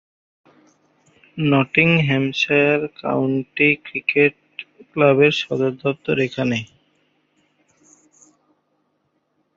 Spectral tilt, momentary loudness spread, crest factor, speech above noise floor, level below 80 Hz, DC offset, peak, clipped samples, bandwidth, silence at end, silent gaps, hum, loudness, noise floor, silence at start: -6.5 dB/octave; 13 LU; 20 dB; 50 dB; -60 dBFS; under 0.1%; -2 dBFS; under 0.1%; 7.6 kHz; 2.9 s; none; none; -18 LUFS; -69 dBFS; 1.35 s